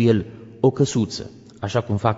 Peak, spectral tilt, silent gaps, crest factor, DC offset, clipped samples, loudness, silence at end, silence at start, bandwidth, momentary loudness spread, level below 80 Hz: -4 dBFS; -6.5 dB/octave; none; 16 dB; under 0.1%; under 0.1%; -22 LUFS; 0 s; 0 s; 8 kHz; 15 LU; -52 dBFS